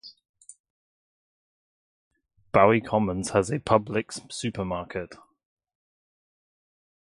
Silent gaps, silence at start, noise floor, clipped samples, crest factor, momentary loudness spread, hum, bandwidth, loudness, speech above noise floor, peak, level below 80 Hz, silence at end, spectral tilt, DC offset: 0.29-0.34 s, 0.60-0.64 s, 0.70-2.11 s; 0.05 s; under -90 dBFS; under 0.1%; 24 dB; 15 LU; none; 11.5 kHz; -25 LUFS; over 65 dB; -4 dBFS; -54 dBFS; 1.95 s; -5.5 dB/octave; under 0.1%